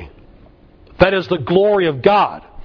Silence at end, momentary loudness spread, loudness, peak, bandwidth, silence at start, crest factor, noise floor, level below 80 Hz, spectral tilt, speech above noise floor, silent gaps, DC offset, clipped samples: 0 s; 4 LU; -15 LUFS; 0 dBFS; 5.4 kHz; 0 s; 16 dB; -45 dBFS; -40 dBFS; -8 dB/octave; 31 dB; none; under 0.1%; under 0.1%